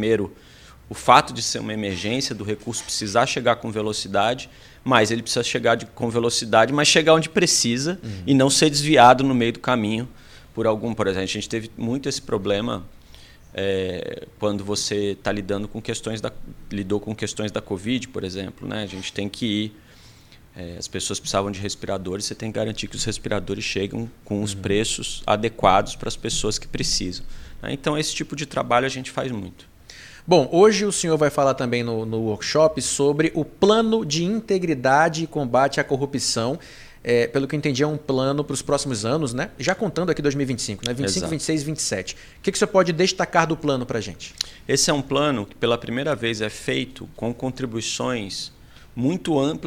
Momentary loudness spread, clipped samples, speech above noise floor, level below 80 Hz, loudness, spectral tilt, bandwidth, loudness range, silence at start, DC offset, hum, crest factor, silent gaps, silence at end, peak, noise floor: 13 LU; under 0.1%; 26 dB; -46 dBFS; -22 LUFS; -4 dB/octave; 16.5 kHz; 9 LU; 0 s; under 0.1%; none; 22 dB; none; 0 s; 0 dBFS; -48 dBFS